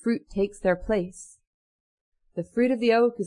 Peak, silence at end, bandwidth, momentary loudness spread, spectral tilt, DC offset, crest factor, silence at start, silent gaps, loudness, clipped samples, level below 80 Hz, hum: -10 dBFS; 0 s; 11 kHz; 16 LU; -6 dB/octave; under 0.1%; 16 dB; 0.05 s; 1.47-2.12 s; -25 LUFS; under 0.1%; -50 dBFS; none